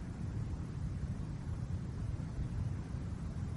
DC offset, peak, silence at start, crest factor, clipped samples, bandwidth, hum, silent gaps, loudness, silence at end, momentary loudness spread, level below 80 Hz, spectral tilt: under 0.1%; -28 dBFS; 0 s; 12 dB; under 0.1%; 11.5 kHz; none; none; -41 LUFS; 0 s; 2 LU; -46 dBFS; -8 dB/octave